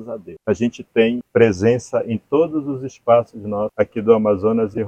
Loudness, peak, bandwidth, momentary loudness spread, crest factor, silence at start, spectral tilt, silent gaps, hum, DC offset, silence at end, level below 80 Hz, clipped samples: -19 LUFS; 0 dBFS; 8.8 kHz; 10 LU; 18 dB; 0 s; -7 dB/octave; none; none; under 0.1%; 0 s; -54 dBFS; under 0.1%